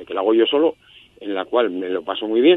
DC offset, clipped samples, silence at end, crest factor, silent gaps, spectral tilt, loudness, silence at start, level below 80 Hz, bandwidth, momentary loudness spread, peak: under 0.1%; under 0.1%; 0 s; 16 dB; none; -6.5 dB/octave; -20 LUFS; 0 s; -64 dBFS; 4 kHz; 11 LU; -2 dBFS